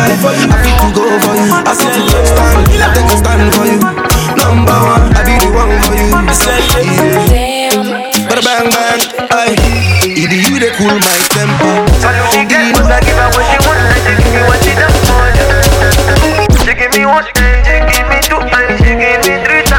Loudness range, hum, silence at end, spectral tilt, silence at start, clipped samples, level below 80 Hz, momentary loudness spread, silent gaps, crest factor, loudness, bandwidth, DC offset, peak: 2 LU; none; 0 s; -4 dB/octave; 0 s; under 0.1%; -14 dBFS; 2 LU; none; 8 dB; -8 LUFS; 18 kHz; under 0.1%; 0 dBFS